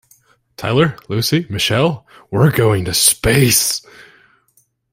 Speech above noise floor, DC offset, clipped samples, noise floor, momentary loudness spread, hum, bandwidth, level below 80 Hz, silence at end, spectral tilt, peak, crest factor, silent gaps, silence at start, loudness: 44 dB; under 0.1%; under 0.1%; -59 dBFS; 11 LU; none; 16.5 kHz; -40 dBFS; 0.9 s; -4 dB/octave; 0 dBFS; 16 dB; none; 0.6 s; -15 LUFS